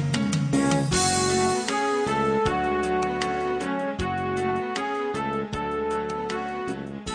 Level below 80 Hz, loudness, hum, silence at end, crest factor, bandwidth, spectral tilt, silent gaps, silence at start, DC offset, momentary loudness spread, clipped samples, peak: -46 dBFS; -25 LUFS; none; 0 s; 16 dB; 10.5 kHz; -4.5 dB/octave; none; 0 s; under 0.1%; 7 LU; under 0.1%; -10 dBFS